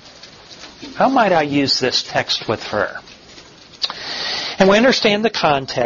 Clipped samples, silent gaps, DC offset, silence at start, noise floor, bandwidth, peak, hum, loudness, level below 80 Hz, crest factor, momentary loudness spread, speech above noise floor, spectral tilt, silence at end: under 0.1%; none; under 0.1%; 0.05 s; -42 dBFS; 7.4 kHz; -2 dBFS; none; -17 LUFS; -52 dBFS; 16 dB; 21 LU; 26 dB; -4 dB/octave; 0 s